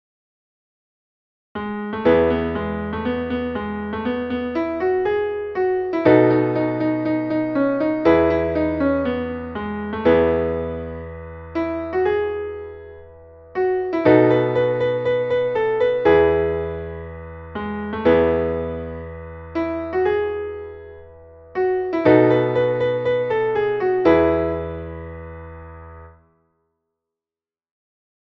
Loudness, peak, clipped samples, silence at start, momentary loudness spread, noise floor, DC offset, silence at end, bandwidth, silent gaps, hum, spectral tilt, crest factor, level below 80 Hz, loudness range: -20 LUFS; -2 dBFS; under 0.1%; 1.55 s; 18 LU; under -90 dBFS; under 0.1%; 2.25 s; 6 kHz; none; none; -9 dB/octave; 18 dB; -42 dBFS; 6 LU